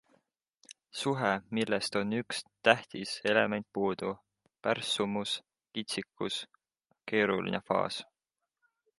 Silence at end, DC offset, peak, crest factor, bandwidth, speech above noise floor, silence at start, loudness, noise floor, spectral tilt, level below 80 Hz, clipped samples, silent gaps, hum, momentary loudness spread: 0.95 s; under 0.1%; -6 dBFS; 28 dB; 11.5 kHz; 57 dB; 0.7 s; -32 LUFS; -89 dBFS; -4 dB/octave; -72 dBFS; under 0.1%; none; none; 11 LU